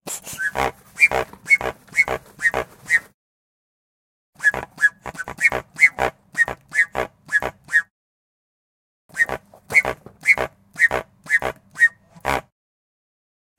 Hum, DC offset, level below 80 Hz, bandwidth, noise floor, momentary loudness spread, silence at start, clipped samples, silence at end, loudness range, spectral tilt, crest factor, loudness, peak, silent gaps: none; under 0.1%; -48 dBFS; 17 kHz; under -90 dBFS; 12 LU; 0.05 s; under 0.1%; 1.2 s; 3 LU; -2.5 dB/octave; 22 dB; -20 LUFS; -2 dBFS; 3.14-4.33 s, 7.90-9.09 s